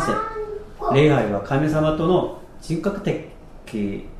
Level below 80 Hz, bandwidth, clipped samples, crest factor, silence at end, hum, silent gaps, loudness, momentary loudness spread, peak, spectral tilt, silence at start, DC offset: -40 dBFS; 13 kHz; under 0.1%; 18 dB; 0 s; none; none; -22 LUFS; 14 LU; -4 dBFS; -7 dB/octave; 0 s; under 0.1%